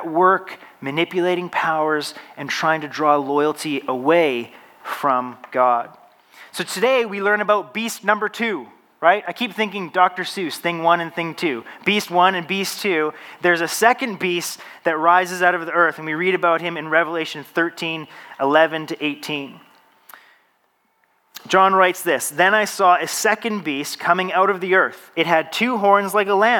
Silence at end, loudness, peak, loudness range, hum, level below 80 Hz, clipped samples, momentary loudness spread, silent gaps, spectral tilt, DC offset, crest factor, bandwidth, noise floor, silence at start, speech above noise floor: 0 s; -19 LUFS; -2 dBFS; 4 LU; none; -80 dBFS; under 0.1%; 10 LU; none; -3.5 dB/octave; under 0.1%; 18 dB; 19 kHz; -65 dBFS; 0 s; 45 dB